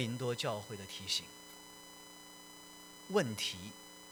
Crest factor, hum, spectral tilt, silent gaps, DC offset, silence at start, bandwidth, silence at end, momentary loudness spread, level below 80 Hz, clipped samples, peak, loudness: 22 dB; 60 Hz at -65 dBFS; -3.5 dB/octave; none; under 0.1%; 0 s; over 20 kHz; 0 s; 17 LU; -76 dBFS; under 0.1%; -20 dBFS; -38 LUFS